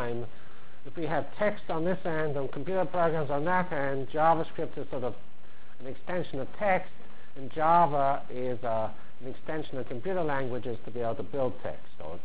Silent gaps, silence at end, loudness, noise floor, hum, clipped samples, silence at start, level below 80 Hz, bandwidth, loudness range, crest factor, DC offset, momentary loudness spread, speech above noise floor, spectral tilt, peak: none; 0 s; -31 LUFS; -56 dBFS; none; under 0.1%; 0 s; -58 dBFS; 4 kHz; 5 LU; 20 dB; 4%; 19 LU; 26 dB; -10 dB/octave; -10 dBFS